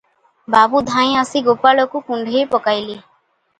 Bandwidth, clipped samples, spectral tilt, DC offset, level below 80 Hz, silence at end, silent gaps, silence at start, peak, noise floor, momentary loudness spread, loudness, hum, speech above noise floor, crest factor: 9.8 kHz; under 0.1%; -4 dB/octave; under 0.1%; -56 dBFS; 0.6 s; none; 0.5 s; 0 dBFS; -61 dBFS; 9 LU; -15 LUFS; none; 46 dB; 16 dB